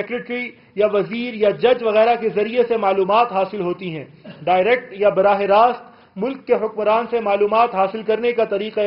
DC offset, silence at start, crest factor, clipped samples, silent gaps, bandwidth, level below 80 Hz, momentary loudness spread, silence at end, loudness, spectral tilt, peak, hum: under 0.1%; 0 s; 16 dB; under 0.1%; none; 5.6 kHz; -60 dBFS; 11 LU; 0 s; -18 LUFS; -3.5 dB/octave; -2 dBFS; none